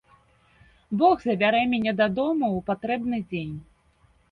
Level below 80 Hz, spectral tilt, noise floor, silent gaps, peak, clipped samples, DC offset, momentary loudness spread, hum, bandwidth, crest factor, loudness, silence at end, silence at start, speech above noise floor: -58 dBFS; -8 dB/octave; -62 dBFS; none; -8 dBFS; under 0.1%; under 0.1%; 11 LU; none; 6.2 kHz; 16 dB; -24 LUFS; 0.7 s; 0.9 s; 38 dB